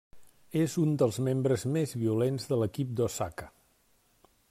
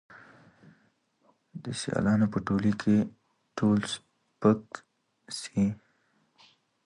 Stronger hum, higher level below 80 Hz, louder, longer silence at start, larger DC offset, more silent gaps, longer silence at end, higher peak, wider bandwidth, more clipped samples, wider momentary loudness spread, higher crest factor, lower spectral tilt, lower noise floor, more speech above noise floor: neither; second, -64 dBFS vs -58 dBFS; about the same, -30 LUFS vs -28 LUFS; second, 0.15 s vs 1.55 s; neither; neither; about the same, 1.05 s vs 1.1 s; second, -14 dBFS vs -10 dBFS; first, 15.5 kHz vs 11.5 kHz; neither; second, 7 LU vs 17 LU; second, 16 dB vs 22 dB; about the same, -6.5 dB/octave vs -6.5 dB/octave; about the same, -68 dBFS vs -70 dBFS; second, 39 dB vs 43 dB